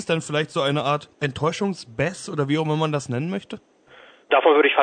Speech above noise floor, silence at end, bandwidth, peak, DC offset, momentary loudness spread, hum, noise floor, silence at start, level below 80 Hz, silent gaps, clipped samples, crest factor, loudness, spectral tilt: 28 dB; 0 s; 9.4 kHz; -4 dBFS; under 0.1%; 12 LU; none; -50 dBFS; 0 s; -58 dBFS; none; under 0.1%; 20 dB; -23 LUFS; -5.5 dB/octave